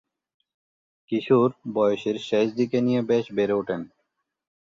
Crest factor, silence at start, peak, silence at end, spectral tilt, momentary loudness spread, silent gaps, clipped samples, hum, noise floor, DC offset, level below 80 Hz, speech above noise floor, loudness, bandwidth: 18 dB; 1.1 s; -8 dBFS; 0.85 s; -7 dB/octave; 9 LU; none; under 0.1%; none; -77 dBFS; under 0.1%; -68 dBFS; 54 dB; -24 LUFS; 7.6 kHz